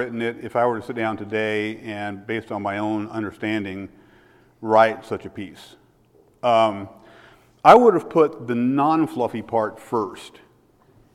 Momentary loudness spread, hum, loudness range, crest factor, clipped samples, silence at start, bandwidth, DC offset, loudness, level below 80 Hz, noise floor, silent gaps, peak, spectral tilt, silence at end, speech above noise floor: 16 LU; none; 8 LU; 22 dB; under 0.1%; 0 s; 13.5 kHz; under 0.1%; -21 LUFS; -62 dBFS; -57 dBFS; none; 0 dBFS; -6.5 dB/octave; 0.85 s; 36 dB